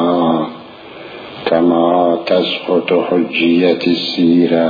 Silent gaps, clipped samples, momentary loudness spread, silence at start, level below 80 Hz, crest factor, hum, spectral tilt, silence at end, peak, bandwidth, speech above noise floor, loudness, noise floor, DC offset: none; under 0.1%; 19 LU; 0 s; -56 dBFS; 14 dB; none; -7.5 dB/octave; 0 s; 0 dBFS; 5 kHz; 21 dB; -14 LUFS; -33 dBFS; under 0.1%